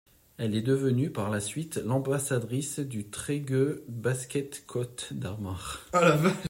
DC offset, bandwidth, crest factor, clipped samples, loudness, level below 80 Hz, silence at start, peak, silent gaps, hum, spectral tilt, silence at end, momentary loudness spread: under 0.1%; 16.5 kHz; 20 dB; under 0.1%; -30 LUFS; -60 dBFS; 0.4 s; -8 dBFS; none; none; -5.5 dB/octave; 0 s; 12 LU